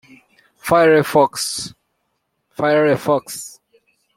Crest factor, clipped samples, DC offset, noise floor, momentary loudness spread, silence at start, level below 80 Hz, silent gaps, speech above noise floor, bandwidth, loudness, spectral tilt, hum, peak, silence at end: 18 dB; under 0.1%; under 0.1%; -71 dBFS; 18 LU; 0.65 s; -58 dBFS; none; 55 dB; 16.5 kHz; -16 LUFS; -4.5 dB/octave; none; -2 dBFS; 0.65 s